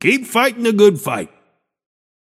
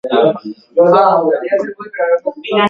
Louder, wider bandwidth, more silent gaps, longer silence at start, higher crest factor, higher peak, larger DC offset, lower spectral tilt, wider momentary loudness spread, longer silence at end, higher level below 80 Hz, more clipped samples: about the same, -15 LUFS vs -14 LUFS; first, 16 kHz vs 5.6 kHz; neither; about the same, 0 s vs 0.05 s; about the same, 18 dB vs 14 dB; about the same, 0 dBFS vs 0 dBFS; neither; second, -4.5 dB/octave vs -7 dB/octave; about the same, 12 LU vs 10 LU; first, 1 s vs 0 s; second, -68 dBFS vs -62 dBFS; neither